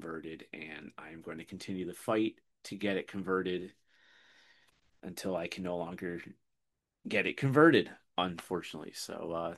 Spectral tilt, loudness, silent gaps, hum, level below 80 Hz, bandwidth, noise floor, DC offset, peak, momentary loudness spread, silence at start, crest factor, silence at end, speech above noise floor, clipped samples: -5.5 dB/octave; -33 LUFS; none; none; -72 dBFS; 12.5 kHz; -85 dBFS; under 0.1%; -10 dBFS; 18 LU; 0 s; 26 dB; 0 s; 51 dB; under 0.1%